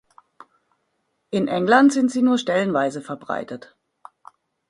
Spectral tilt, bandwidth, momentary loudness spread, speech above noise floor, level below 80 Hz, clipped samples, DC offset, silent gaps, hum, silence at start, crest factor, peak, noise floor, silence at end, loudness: -5.5 dB/octave; 11.5 kHz; 16 LU; 53 dB; -66 dBFS; under 0.1%; under 0.1%; none; none; 1.3 s; 20 dB; -2 dBFS; -72 dBFS; 1.1 s; -20 LUFS